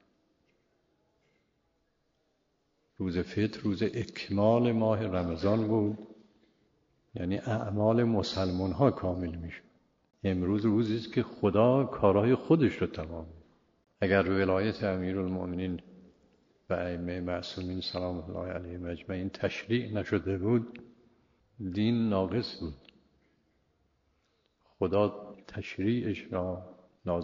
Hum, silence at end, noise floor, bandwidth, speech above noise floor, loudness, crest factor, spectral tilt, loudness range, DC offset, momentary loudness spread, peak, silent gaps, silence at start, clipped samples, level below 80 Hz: none; 0 s; -75 dBFS; 7.4 kHz; 46 dB; -30 LUFS; 22 dB; -6.5 dB/octave; 8 LU; under 0.1%; 14 LU; -10 dBFS; none; 3 s; under 0.1%; -58 dBFS